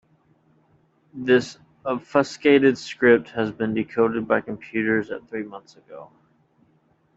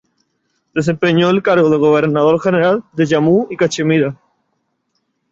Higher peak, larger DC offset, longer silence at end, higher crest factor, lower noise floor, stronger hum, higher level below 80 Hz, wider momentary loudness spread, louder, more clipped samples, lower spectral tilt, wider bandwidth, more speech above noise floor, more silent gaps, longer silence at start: about the same, -2 dBFS vs -2 dBFS; neither; about the same, 1.1 s vs 1.2 s; first, 20 dB vs 12 dB; second, -63 dBFS vs -68 dBFS; neither; second, -64 dBFS vs -56 dBFS; first, 20 LU vs 6 LU; second, -22 LUFS vs -14 LUFS; neither; about the same, -6 dB/octave vs -6.5 dB/octave; about the same, 8 kHz vs 7.8 kHz; second, 41 dB vs 55 dB; neither; first, 1.15 s vs 0.75 s